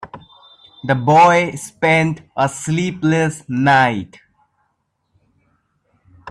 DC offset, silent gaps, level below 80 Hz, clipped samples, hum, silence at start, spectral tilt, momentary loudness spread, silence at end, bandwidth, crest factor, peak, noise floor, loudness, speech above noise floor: under 0.1%; none; -56 dBFS; under 0.1%; none; 0 s; -5.5 dB/octave; 14 LU; 0 s; 13 kHz; 16 dB; -2 dBFS; -69 dBFS; -16 LUFS; 53 dB